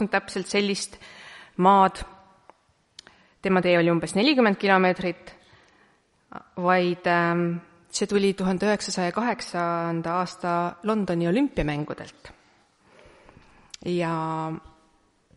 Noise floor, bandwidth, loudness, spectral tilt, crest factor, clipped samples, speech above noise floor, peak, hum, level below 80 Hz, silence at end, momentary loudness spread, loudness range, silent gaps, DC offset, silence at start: -63 dBFS; 11.5 kHz; -24 LUFS; -5.5 dB/octave; 20 dB; under 0.1%; 39 dB; -6 dBFS; none; -52 dBFS; 0.75 s; 19 LU; 6 LU; none; under 0.1%; 0 s